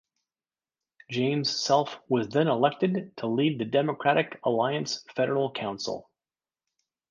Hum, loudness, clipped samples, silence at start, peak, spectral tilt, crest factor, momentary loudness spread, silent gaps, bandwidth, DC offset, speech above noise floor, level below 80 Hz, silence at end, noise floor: none; -27 LUFS; under 0.1%; 1.1 s; -8 dBFS; -5 dB/octave; 20 dB; 8 LU; none; 9.8 kHz; under 0.1%; over 63 dB; -72 dBFS; 1.1 s; under -90 dBFS